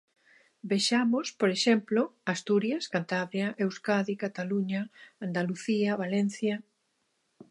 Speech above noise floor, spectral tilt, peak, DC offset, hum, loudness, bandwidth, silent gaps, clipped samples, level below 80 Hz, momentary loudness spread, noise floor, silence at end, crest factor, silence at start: 47 dB; -5 dB/octave; -12 dBFS; under 0.1%; none; -29 LUFS; 11.5 kHz; none; under 0.1%; -80 dBFS; 8 LU; -76 dBFS; 0.9 s; 18 dB; 0.65 s